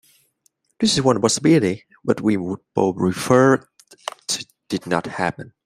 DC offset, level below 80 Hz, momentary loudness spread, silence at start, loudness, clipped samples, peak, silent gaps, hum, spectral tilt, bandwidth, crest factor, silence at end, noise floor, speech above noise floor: under 0.1%; -56 dBFS; 13 LU; 0.8 s; -20 LUFS; under 0.1%; -2 dBFS; none; none; -4.5 dB/octave; 16 kHz; 18 dB; 0.15 s; -65 dBFS; 47 dB